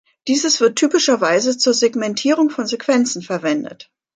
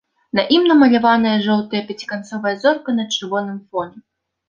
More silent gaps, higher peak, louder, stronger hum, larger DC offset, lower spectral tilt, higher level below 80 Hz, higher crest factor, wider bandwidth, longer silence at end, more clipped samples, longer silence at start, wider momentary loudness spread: neither; about the same, -4 dBFS vs -2 dBFS; about the same, -17 LUFS vs -17 LUFS; neither; neither; second, -2.5 dB/octave vs -5 dB/octave; second, -70 dBFS vs -62 dBFS; about the same, 14 dB vs 16 dB; first, 9.6 kHz vs 7.4 kHz; second, 0.35 s vs 0.5 s; neither; about the same, 0.25 s vs 0.35 s; second, 7 LU vs 14 LU